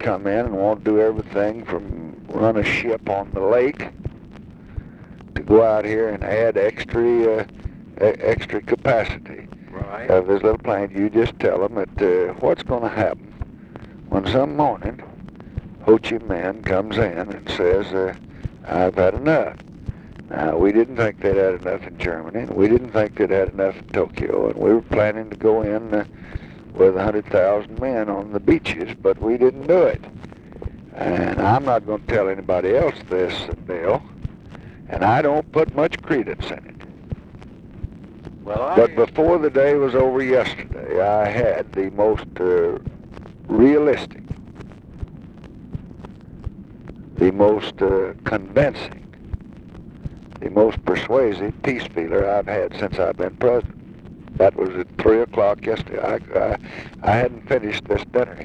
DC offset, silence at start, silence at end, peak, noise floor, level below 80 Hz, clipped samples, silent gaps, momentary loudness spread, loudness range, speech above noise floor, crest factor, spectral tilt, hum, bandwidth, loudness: under 0.1%; 0 s; 0 s; -2 dBFS; -40 dBFS; -40 dBFS; under 0.1%; none; 19 LU; 3 LU; 21 dB; 18 dB; -8 dB/octave; none; 8.6 kHz; -20 LUFS